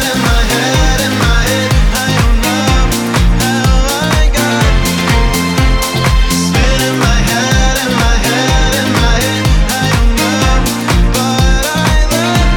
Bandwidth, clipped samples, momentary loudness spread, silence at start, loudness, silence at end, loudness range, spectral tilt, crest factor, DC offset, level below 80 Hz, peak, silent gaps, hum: 19.5 kHz; under 0.1%; 1 LU; 0 s; -11 LUFS; 0 s; 0 LU; -4 dB/octave; 10 dB; under 0.1%; -14 dBFS; 0 dBFS; none; none